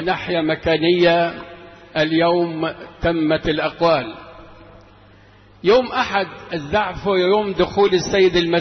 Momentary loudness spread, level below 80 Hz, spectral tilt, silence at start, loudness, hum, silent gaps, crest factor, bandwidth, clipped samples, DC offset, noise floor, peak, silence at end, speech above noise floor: 11 LU; -44 dBFS; -5.5 dB/octave; 0 s; -18 LUFS; none; none; 14 dB; 6.4 kHz; under 0.1%; under 0.1%; -48 dBFS; -6 dBFS; 0 s; 30 dB